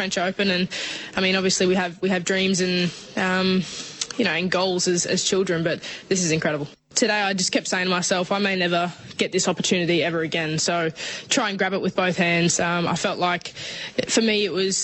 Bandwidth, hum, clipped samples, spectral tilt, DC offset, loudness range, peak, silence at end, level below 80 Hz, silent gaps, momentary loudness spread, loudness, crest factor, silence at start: 8.6 kHz; none; under 0.1%; -3.5 dB/octave; under 0.1%; 1 LU; -4 dBFS; 0 s; -60 dBFS; none; 7 LU; -22 LUFS; 18 dB; 0 s